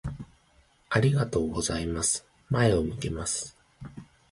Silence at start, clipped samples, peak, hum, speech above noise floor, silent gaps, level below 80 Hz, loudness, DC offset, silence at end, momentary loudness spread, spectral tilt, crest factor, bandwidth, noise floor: 0.05 s; under 0.1%; -8 dBFS; none; 36 dB; none; -46 dBFS; -27 LUFS; under 0.1%; 0.25 s; 21 LU; -4.5 dB/octave; 20 dB; 11.5 kHz; -63 dBFS